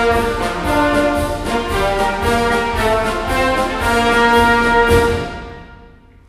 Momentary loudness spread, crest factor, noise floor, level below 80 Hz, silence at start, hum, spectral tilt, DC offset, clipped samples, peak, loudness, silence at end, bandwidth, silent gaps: 8 LU; 16 dB; -43 dBFS; -28 dBFS; 0 s; none; -5 dB/octave; under 0.1%; under 0.1%; 0 dBFS; -15 LUFS; 0.45 s; 16 kHz; none